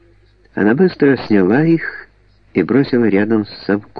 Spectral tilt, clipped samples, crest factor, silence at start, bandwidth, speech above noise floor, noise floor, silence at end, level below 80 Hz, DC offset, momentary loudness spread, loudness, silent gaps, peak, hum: -10 dB/octave; under 0.1%; 14 dB; 0.55 s; 5.4 kHz; 36 dB; -50 dBFS; 0 s; -52 dBFS; under 0.1%; 9 LU; -15 LUFS; none; -2 dBFS; none